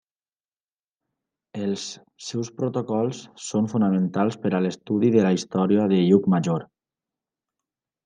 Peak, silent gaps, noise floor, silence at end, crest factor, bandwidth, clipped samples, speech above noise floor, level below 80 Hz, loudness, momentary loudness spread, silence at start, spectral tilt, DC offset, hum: -4 dBFS; none; under -90 dBFS; 1.4 s; 20 dB; 9.4 kHz; under 0.1%; over 68 dB; -70 dBFS; -23 LUFS; 12 LU; 1.55 s; -7 dB/octave; under 0.1%; none